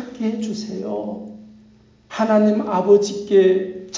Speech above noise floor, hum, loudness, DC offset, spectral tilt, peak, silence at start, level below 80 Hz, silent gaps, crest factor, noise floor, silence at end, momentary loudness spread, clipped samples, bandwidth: 33 dB; none; -19 LUFS; under 0.1%; -6 dB/octave; -4 dBFS; 0 s; -62 dBFS; none; 16 dB; -51 dBFS; 0 s; 15 LU; under 0.1%; 7.6 kHz